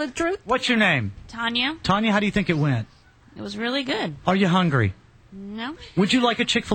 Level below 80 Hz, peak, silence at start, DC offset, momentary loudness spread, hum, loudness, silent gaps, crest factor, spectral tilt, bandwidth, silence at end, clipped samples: -50 dBFS; -6 dBFS; 0 s; under 0.1%; 14 LU; none; -22 LUFS; none; 18 dB; -5.5 dB/octave; 9 kHz; 0 s; under 0.1%